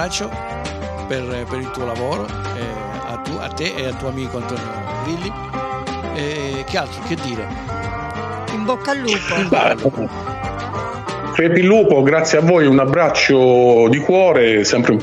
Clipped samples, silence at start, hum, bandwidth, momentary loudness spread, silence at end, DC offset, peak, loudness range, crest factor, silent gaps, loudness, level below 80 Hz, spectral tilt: under 0.1%; 0 s; none; 11.5 kHz; 14 LU; 0 s; under 0.1%; -2 dBFS; 12 LU; 14 dB; none; -17 LUFS; -40 dBFS; -5.5 dB/octave